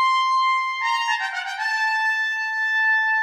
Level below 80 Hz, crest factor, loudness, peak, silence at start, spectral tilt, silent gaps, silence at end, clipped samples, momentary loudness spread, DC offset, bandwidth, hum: -80 dBFS; 10 dB; -20 LUFS; -10 dBFS; 0 s; 6.5 dB/octave; none; 0 s; under 0.1%; 6 LU; under 0.1%; 14 kHz; none